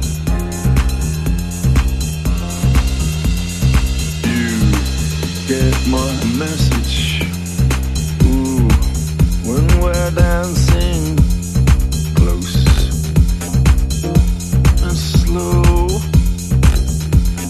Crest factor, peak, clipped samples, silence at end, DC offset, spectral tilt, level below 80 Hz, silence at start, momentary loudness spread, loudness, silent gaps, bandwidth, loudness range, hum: 14 dB; 0 dBFS; under 0.1%; 0 s; under 0.1%; -5.5 dB/octave; -16 dBFS; 0 s; 5 LU; -16 LUFS; none; 14 kHz; 2 LU; none